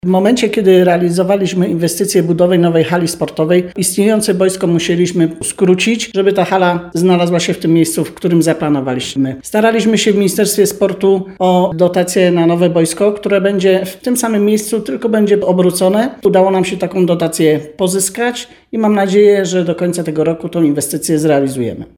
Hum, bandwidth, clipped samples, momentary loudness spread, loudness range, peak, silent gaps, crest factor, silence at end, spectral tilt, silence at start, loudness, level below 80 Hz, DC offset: none; 18.5 kHz; under 0.1%; 5 LU; 1 LU; 0 dBFS; none; 12 dB; 0.1 s; -5 dB/octave; 0.05 s; -13 LUFS; -50 dBFS; under 0.1%